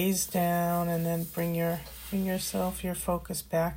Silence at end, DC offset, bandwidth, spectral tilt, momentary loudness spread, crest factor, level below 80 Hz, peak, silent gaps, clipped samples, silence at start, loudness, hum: 0 s; under 0.1%; 16.5 kHz; -5 dB/octave; 5 LU; 14 dB; -50 dBFS; -16 dBFS; none; under 0.1%; 0 s; -30 LUFS; none